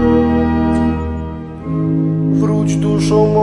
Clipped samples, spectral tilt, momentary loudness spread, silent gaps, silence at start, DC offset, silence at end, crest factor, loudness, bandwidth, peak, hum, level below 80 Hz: under 0.1%; -8 dB/octave; 10 LU; none; 0 s; under 0.1%; 0 s; 12 dB; -15 LUFS; 11.5 kHz; -2 dBFS; none; -30 dBFS